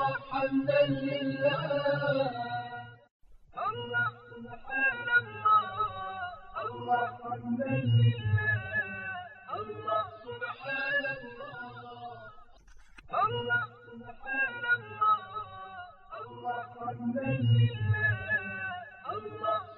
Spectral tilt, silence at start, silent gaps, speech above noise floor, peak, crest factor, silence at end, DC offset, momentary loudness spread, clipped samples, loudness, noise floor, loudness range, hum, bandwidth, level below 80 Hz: -4.5 dB/octave; 0 s; 3.11-3.20 s; 25 dB; -14 dBFS; 16 dB; 0 s; under 0.1%; 18 LU; under 0.1%; -31 LUFS; -53 dBFS; 5 LU; none; 5.2 kHz; -60 dBFS